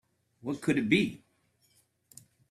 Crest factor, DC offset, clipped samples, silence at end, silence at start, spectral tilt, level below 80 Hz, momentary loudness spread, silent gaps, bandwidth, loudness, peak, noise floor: 22 dB; under 0.1%; under 0.1%; 1.35 s; 0.45 s; -5.5 dB/octave; -68 dBFS; 17 LU; none; 15 kHz; -29 LUFS; -12 dBFS; -71 dBFS